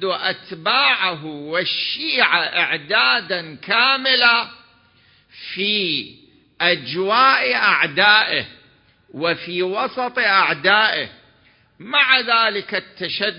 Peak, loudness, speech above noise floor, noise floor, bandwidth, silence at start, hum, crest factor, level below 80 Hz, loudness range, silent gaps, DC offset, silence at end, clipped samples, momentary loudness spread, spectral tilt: 0 dBFS; -17 LUFS; 37 dB; -55 dBFS; 5.4 kHz; 0 s; none; 20 dB; -66 dBFS; 3 LU; none; under 0.1%; 0 s; under 0.1%; 11 LU; -6.5 dB/octave